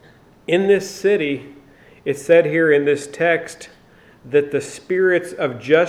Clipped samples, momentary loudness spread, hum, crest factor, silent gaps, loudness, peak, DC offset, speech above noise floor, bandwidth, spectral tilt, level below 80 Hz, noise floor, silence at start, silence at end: under 0.1%; 12 LU; none; 18 dB; none; -18 LUFS; -2 dBFS; under 0.1%; 31 dB; 14 kHz; -5.5 dB/octave; -62 dBFS; -49 dBFS; 0.5 s; 0 s